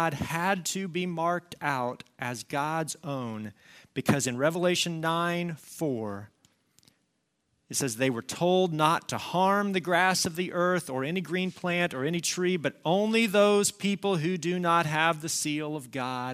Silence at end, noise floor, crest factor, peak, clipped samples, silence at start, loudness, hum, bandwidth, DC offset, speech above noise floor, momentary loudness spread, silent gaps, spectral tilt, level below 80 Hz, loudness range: 0 s; -76 dBFS; 20 dB; -8 dBFS; under 0.1%; 0 s; -28 LUFS; none; 16 kHz; under 0.1%; 48 dB; 11 LU; none; -4 dB/octave; -70 dBFS; 6 LU